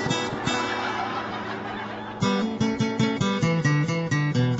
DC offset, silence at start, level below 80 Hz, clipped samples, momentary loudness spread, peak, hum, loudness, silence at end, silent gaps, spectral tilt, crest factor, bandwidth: under 0.1%; 0 s; -54 dBFS; under 0.1%; 9 LU; -10 dBFS; none; -25 LUFS; 0 s; none; -5.5 dB/octave; 14 dB; 8.2 kHz